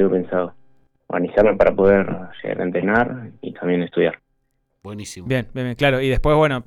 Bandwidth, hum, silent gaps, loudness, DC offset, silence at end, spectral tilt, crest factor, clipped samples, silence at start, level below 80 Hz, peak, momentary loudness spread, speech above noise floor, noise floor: 12.5 kHz; none; none; -19 LUFS; under 0.1%; 0.05 s; -7 dB/octave; 16 dB; under 0.1%; 0 s; -36 dBFS; -4 dBFS; 16 LU; 50 dB; -69 dBFS